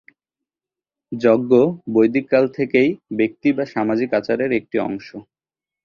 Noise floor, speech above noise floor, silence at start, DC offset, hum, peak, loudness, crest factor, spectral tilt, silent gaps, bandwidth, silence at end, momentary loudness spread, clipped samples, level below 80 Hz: -90 dBFS; 72 dB; 1.1 s; under 0.1%; none; -2 dBFS; -19 LUFS; 18 dB; -8 dB/octave; none; 7 kHz; 0.65 s; 8 LU; under 0.1%; -60 dBFS